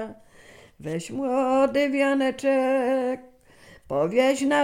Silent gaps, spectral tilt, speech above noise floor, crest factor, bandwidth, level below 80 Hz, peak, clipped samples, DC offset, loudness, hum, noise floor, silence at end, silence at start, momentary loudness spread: none; -5 dB/octave; 29 dB; 16 dB; 15.5 kHz; -62 dBFS; -8 dBFS; under 0.1%; under 0.1%; -23 LUFS; none; -52 dBFS; 0 s; 0 s; 12 LU